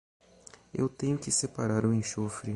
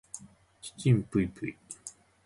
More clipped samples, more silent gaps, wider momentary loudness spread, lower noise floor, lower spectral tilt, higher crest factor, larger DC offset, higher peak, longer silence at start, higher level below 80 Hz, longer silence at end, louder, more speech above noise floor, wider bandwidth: neither; neither; second, 6 LU vs 19 LU; first, -55 dBFS vs -50 dBFS; second, -5 dB/octave vs -6.5 dB/octave; about the same, 16 dB vs 20 dB; neither; about the same, -14 dBFS vs -12 dBFS; first, 0.75 s vs 0.15 s; about the same, -60 dBFS vs -56 dBFS; second, 0 s vs 0.35 s; about the same, -30 LUFS vs -30 LUFS; first, 25 dB vs 21 dB; about the same, 11.5 kHz vs 11.5 kHz